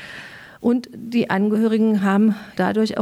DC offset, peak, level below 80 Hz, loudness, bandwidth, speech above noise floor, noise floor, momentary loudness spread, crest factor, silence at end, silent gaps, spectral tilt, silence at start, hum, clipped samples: under 0.1%; -6 dBFS; -62 dBFS; -20 LUFS; 12 kHz; 20 dB; -39 dBFS; 11 LU; 14 dB; 0 s; none; -7 dB/octave; 0 s; none; under 0.1%